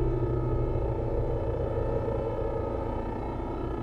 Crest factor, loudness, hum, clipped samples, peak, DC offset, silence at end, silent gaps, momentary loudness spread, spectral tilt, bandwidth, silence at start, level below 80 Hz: 12 dB; -31 LUFS; none; under 0.1%; -16 dBFS; under 0.1%; 0 s; none; 5 LU; -10 dB/octave; 5.6 kHz; 0 s; -34 dBFS